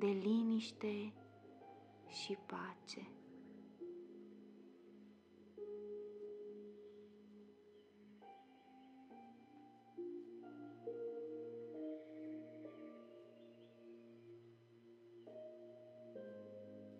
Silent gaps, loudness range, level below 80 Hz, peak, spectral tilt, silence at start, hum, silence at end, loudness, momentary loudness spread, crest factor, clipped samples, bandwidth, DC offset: none; 9 LU; under -90 dBFS; -28 dBFS; -6 dB/octave; 0 s; none; 0 s; -48 LUFS; 18 LU; 22 dB; under 0.1%; 9.4 kHz; under 0.1%